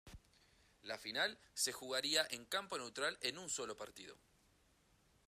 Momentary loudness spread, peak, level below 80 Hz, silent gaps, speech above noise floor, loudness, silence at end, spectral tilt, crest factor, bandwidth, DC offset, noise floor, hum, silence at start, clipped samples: 15 LU; -20 dBFS; -74 dBFS; none; 31 dB; -41 LUFS; 1.15 s; -0.5 dB/octave; 24 dB; 15 kHz; under 0.1%; -74 dBFS; none; 0.05 s; under 0.1%